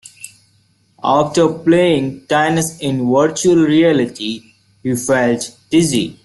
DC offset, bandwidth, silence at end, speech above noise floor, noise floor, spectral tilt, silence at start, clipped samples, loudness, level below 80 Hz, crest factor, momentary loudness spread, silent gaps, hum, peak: under 0.1%; 12.5 kHz; 0.1 s; 42 dB; -57 dBFS; -5 dB/octave; 0.2 s; under 0.1%; -15 LUFS; -52 dBFS; 14 dB; 12 LU; none; none; -2 dBFS